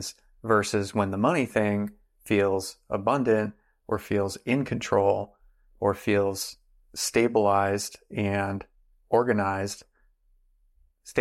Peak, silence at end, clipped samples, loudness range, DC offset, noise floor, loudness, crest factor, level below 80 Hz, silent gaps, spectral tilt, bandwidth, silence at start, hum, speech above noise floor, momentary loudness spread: -10 dBFS; 0 s; under 0.1%; 2 LU; under 0.1%; -64 dBFS; -26 LUFS; 18 dB; -60 dBFS; none; -5 dB/octave; 16 kHz; 0 s; none; 39 dB; 11 LU